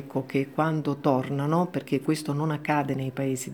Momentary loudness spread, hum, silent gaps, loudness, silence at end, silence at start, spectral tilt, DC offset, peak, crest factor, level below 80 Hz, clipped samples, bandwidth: 4 LU; none; none; -27 LUFS; 0 s; 0 s; -6.5 dB/octave; under 0.1%; -8 dBFS; 18 dB; -72 dBFS; under 0.1%; 19.5 kHz